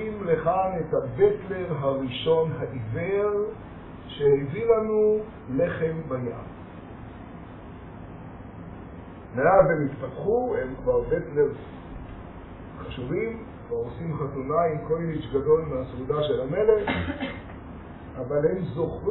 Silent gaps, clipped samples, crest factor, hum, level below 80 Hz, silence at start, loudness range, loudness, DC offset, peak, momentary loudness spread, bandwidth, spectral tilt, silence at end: none; under 0.1%; 22 dB; none; -48 dBFS; 0 s; 7 LU; -26 LUFS; under 0.1%; -4 dBFS; 19 LU; 4.1 kHz; -6 dB/octave; 0 s